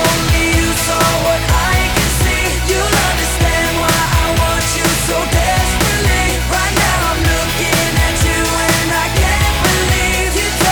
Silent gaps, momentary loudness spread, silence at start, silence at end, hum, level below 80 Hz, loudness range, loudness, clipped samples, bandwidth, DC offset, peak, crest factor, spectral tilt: none; 2 LU; 0 s; 0 s; none; -20 dBFS; 0 LU; -13 LUFS; under 0.1%; over 20 kHz; under 0.1%; -4 dBFS; 10 dB; -3.5 dB/octave